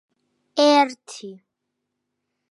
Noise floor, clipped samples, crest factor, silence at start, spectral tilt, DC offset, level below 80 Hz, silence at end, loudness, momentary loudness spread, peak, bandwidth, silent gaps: -79 dBFS; under 0.1%; 18 dB; 0.55 s; -2.5 dB/octave; under 0.1%; -88 dBFS; 1.15 s; -19 LUFS; 21 LU; -6 dBFS; 11.5 kHz; none